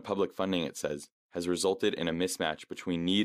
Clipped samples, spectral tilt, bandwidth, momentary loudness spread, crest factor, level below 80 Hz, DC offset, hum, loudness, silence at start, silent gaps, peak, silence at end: under 0.1%; -4 dB/octave; 15.5 kHz; 8 LU; 18 dB; -64 dBFS; under 0.1%; none; -32 LUFS; 0 s; 1.12-1.29 s; -14 dBFS; 0 s